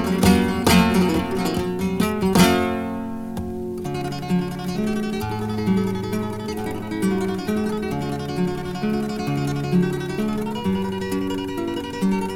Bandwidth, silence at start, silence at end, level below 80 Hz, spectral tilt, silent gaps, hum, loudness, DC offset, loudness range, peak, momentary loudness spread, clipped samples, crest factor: 17 kHz; 0 s; 0 s; -42 dBFS; -6 dB/octave; none; none; -22 LUFS; under 0.1%; 5 LU; -2 dBFS; 11 LU; under 0.1%; 20 dB